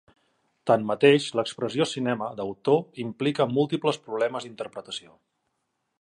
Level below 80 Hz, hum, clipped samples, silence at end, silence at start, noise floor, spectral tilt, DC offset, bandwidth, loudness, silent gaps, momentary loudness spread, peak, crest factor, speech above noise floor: -72 dBFS; none; under 0.1%; 1 s; 0.65 s; -78 dBFS; -5.5 dB/octave; under 0.1%; 11.5 kHz; -25 LUFS; none; 16 LU; -4 dBFS; 22 dB; 52 dB